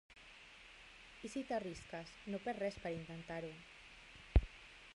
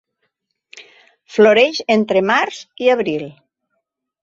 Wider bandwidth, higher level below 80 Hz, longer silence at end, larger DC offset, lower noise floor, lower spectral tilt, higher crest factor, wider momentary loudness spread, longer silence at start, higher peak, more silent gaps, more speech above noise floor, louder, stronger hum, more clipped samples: first, 11.5 kHz vs 7.8 kHz; first, -48 dBFS vs -64 dBFS; second, 0 s vs 0.9 s; neither; second, -60 dBFS vs -73 dBFS; first, -6.5 dB/octave vs -4.5 dB/octave; first, 28 dB vs 18 dB; first, 19 LU vs 13 LU; second, 0.1 s vs 0.75 s; second, -16 dBFS vs 0 dBFS; neither; second, 15 dB vs 59 dB; second, -44 LUFS vs -15 LUFS; neither; neither